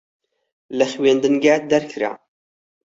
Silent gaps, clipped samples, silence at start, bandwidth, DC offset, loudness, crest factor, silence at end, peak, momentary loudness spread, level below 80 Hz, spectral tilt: none; under 0.1%; 0.7 s; 8 kHz; under 0.1%; -18 LUFS; 18 dB; 0.75 s; -2 dBFS; 10 LU; -64 dBFS; -4.5 dB/octave